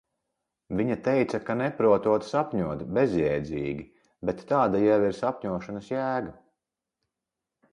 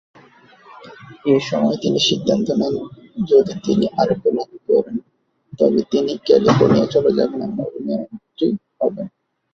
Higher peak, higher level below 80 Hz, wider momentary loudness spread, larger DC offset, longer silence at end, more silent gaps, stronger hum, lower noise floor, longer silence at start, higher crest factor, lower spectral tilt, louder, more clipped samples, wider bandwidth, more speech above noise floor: second, -10 dBFS vs 0 dBFS; about the same, -56 dBFS vs -54 dBFS; about the same, 11 LU vs 12 LU; neither; first, 1.4 s vs 0.45 s; neither; neither; first, -87 dBFS vs -59 dBFS; about the same, 0.7 s vs 0.7 s; about the same, 18 dB vs 18 dB; first, -7.5 dB/octave vs -6 dB/octave; second, -27 LUFS vs -18 LUFS; neither; first, 10.5 kHz vs 7.6 kHz; first, 61 dB vs 41 dB